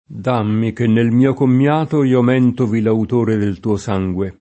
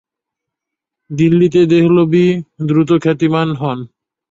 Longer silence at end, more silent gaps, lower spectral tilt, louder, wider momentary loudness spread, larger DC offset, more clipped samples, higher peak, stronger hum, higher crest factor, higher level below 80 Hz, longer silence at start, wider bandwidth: second, 0.1 s vs 0.45 s; neither; about the same, -8.5 dB/octave vs -8 dB/octave; second, -16 LUFS vs -13 LUFS; second, 6 LU vs 10 LU; neither; neither; about the same, -2 dBFS vs -2 dBFS; neither; about the same, 14 dB vs 12 dB; about the same, -50 dBFS vs -52 dBFS; second, 0.1 s vs 1.1 s; first, 8.4 kHz vs 7.6 kHz